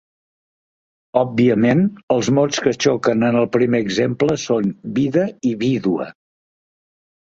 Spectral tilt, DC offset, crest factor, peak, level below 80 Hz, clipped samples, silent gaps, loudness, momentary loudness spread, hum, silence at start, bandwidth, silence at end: -6 dB/octave; under 0.1%; 18 dB; -2 dBFS; -56 dBFS; under 0.1%; 2.03-2.08 s; -18 LUFS; 6 LU; none; 1.15 s; 7.8 kHz; 1.25 s